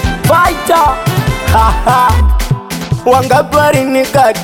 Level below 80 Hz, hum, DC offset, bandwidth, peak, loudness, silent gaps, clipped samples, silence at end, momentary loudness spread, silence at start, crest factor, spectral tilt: -18 dBFS; none; under 0.1%; 19 kHz; 0 dBFS; -10 LUFS; none; under 0.1%; 0 s; 6 LU; 0 s; 10 dB; -5.5 dB/octave